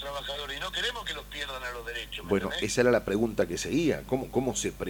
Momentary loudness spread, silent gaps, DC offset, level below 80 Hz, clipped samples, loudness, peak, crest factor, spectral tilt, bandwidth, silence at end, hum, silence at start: 11 LU; none; under 0.1%; -48 dBFS; under 0.1%; -30 LUFS; -10 dBFS; 20 dB; -4 dB/octave; 19 kHz; 0 s; 50 Hz at -45 dBFS; 0 s